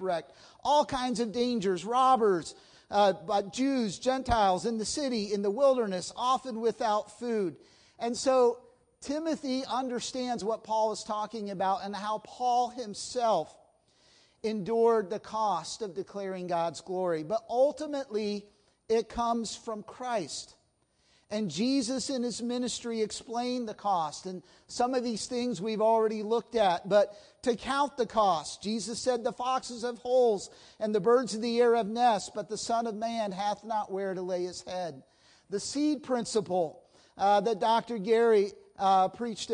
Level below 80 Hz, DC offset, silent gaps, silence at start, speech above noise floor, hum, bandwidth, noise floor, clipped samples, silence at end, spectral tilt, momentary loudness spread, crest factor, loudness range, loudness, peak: -60 dBFS; under 0.1%; none; 0 s; 41 dB; none; 10.5 kHz; -71 dBFS; under 0.1%; 0 s; -4 dB/octave; 11 LU; 18 dB; 5 LU; -30 LUFS; -12 dBFS